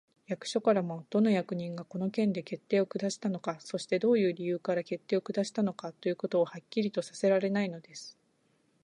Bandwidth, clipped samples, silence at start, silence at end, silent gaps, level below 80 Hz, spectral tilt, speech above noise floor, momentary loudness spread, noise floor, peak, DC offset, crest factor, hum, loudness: 10.5 kHz; under 0.1%; 0.3 s; 0.75 s; none; -80 dBFS; -6 dB/octave; 41 dB; 10 LU; -72 dBFS; -14 dBFS; under 0.1%; 18 dB; none; -31 LUFS